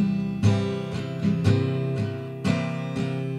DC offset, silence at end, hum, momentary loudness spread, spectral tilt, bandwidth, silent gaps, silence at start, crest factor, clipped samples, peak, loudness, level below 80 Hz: under 0.1%; 0 s; none; 7 LU; -7.5 dB/octave; 11 kHz; none; 0 s; 16 dB; under 0.1%; -8 dBFS; -26 LUFS; -54 dBFS